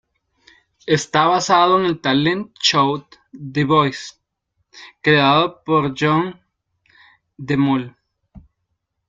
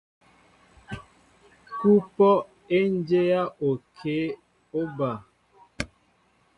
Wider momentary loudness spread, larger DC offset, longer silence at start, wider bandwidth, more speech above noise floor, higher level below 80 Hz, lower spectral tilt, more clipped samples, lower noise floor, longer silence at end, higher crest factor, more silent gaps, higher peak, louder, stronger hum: second, 15 LU vs 20 LU; neither; about the same, 0.85 s vs 0.9 s; second, 9.2 kHz vs 11 kHz; first, 57 dB vs 42 dB; about the same, -56 dBFS vs -58 dBFS; second, -5 dB/octave vs -7.5 dB/octave; neither; first, -74 dBFS vs -65 dBFS; about the same, 0.7 s vs 0.7 s; about the same, 18 dB vs 18 dB; neither; first, -2 dBFS vs -8 dBFS; first, -17 LUFS vs -25 LUFS; neither